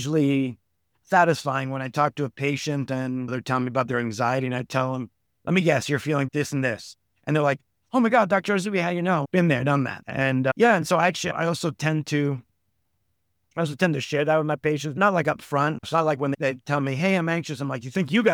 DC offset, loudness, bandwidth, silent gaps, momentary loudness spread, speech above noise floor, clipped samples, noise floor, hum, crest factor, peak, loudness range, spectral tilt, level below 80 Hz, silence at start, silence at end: under 0.1%; -24 LUFS; 16.5 kHz; none; 8 LU; 52 dB; under 0.1%; -75 dBFS; none; 18 dB; -6 dBFS; 4 LU; -6 dB/octave; -64 dBFS; 0 s; 0 s